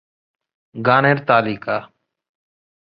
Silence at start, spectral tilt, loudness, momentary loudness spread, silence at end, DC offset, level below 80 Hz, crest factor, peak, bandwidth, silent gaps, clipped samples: 0.75 s; -9.5 dB/octave; -17 LUFS; 11 LU; 1.05 s; under 0.1%; -60 dBFS; 20 dB; -2 dBFS; 5.4 kHz; none; under 0.1%